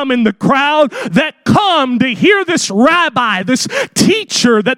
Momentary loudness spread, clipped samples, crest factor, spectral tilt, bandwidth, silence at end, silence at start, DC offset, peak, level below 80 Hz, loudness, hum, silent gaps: 4 LU; under 0.1%; 12 dB; -4 dB/octave; 16 kHz; 0 s; 0 s; under 0.1%; 0 dBFS; -52 dBFS; -12 LUFS; none; none